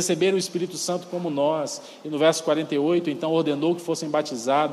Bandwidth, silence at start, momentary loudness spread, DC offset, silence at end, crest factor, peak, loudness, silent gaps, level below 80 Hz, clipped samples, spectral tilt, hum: 13.5 kHz; 0 s; 7 LU; under 0.1%; 0 s; 16 dB; -8 dBFS; -24 LUFS; none; -76 dBFS; under 0.1%; -4.5 dB/octave; none